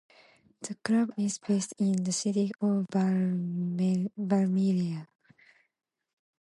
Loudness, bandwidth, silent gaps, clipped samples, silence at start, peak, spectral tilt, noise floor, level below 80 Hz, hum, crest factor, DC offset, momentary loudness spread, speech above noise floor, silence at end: -29 LUFS; 11.5 kHz; none; under 0.1%; 0.6 s; -12 dBFS; -6 dB/octave; -63 dBFS; -76 dBFS; none; 16 dB; under 0.1%; 7 LU; 35 dB; 1.4 s